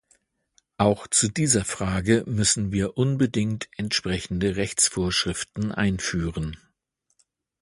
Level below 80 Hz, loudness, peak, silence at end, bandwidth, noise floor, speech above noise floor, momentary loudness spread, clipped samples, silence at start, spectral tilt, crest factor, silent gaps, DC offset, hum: -44 dBFS; -24 LUFS; -4 dBFS; 1.05 s; 11.5 kHz; -74 dBFS; 50 dB; 8 LU; under 0.1%; 0.8 s; -4 dB/octave; 20 dB; none; under 0.1%; none